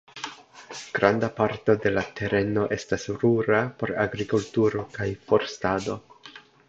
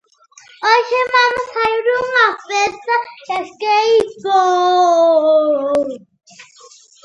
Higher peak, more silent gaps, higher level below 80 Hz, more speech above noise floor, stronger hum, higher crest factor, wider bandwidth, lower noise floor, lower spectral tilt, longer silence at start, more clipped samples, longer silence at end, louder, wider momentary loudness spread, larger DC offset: second, -4 dBFS vs 0 dBFS; neither; about the same, -54 dBFS vs -58 dBFS; second, 24 dB vs 32 dB; neither; first, 22 dB vs 16 dB; second, 8 kHz vs 11 kHz; about the same, -49 dBFS vs -47 dBFS; first, -6 dB/octave vs -2 dB/octave; second, 0.15 s vs 0.6 s; neither; second, 0.3 s vs 0.6 s; second, -25 LUFS vs -15 LUFS; first, 15 LU vs 9 LU; neither